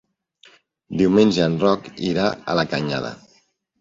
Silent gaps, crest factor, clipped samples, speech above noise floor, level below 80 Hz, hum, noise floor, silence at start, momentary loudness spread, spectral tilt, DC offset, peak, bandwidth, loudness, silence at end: none; 18 dB; under 0.1%; 42 dB; -54 dBFS; none; -61 dBFS; 0.9 s; 11 LU; -6.5 dB/octave; under 0.1%; -2 dBFS; 7.6 kHz; -20 LUFS; 0.65 s